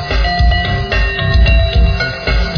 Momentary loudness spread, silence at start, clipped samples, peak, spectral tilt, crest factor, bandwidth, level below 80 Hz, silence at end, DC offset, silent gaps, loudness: 4 LU; 0 s; under 0.1%; -2 dBFS; -6 dB/octave; 10 dB; 5.4 kHz; -14 dBFS; 0 s; under 0.1%; none; -13 LUFS